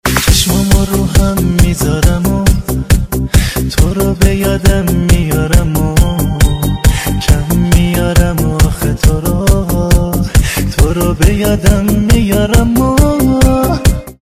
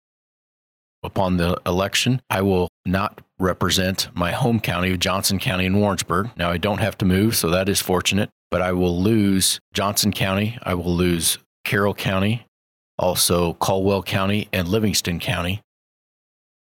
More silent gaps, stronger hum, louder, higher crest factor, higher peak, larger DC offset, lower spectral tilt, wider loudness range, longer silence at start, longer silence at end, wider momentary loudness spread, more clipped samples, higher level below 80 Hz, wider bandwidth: second, none vs 2.69-2.84 s, 8.32-8.51 s, 9.61-9.72 s, 11.46-11.64 s, 12.48-12.98 s; neither; first, -11 LUFS vs -21 LUFS; second, 10 dB vs 16 dB; first, 0 dBFS vs -6 dBFS; first, 0.3% vs under 0.1%; about the same, -5.5 dB/octave vs -4.5 dB/octave; about the same, 1 LU vs 2 LU; second, 0.05 s vs 1.05 s; second, 0.1 s vs 1.1 s; second, 3 LU vs 6 LU; first, 1% vs under 0.1%; first, -14 dBFS vs -46 dBFS; about the same, 16 kHz vs 17.5 kHz